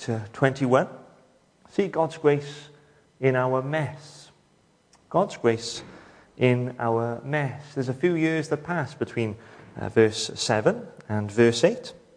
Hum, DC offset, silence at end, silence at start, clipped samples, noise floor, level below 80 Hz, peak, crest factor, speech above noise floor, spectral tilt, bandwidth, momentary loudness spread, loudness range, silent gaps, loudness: none; under 0.1%; 0.2 s; 0 s; under 0.1%; -62 dBFS; -66 dBFS; -4 dBFS; 22 dB; 38 dB; -5.5 dB/octave; 10.5 kHz; 13 LU; 3 LU; none; -25 LUFS